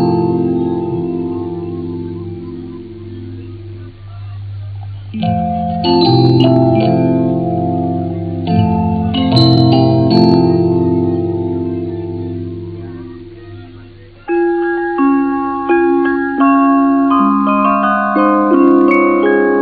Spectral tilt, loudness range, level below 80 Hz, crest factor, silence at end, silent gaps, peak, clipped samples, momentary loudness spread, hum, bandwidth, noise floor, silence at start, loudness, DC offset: -9 dB/octave; 12 LU; -40 dBFS; 14 dB; 0 s; none; 0 dBFS; under 0.1%; 19 LU; none; 5 kHz; -37 dBFS; 0 s; -13 LUFS; under 0.1%